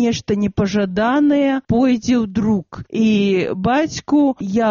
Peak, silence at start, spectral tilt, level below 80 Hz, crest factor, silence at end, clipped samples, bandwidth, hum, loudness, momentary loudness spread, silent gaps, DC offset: -6 dBFS; 0 s; -5.5 dB/octave; -44 dBFS; 10 dB; 0 s; under 0.1%; 7.2 kHz; none; -17 LUFS; 4 LU; none; under 0.1%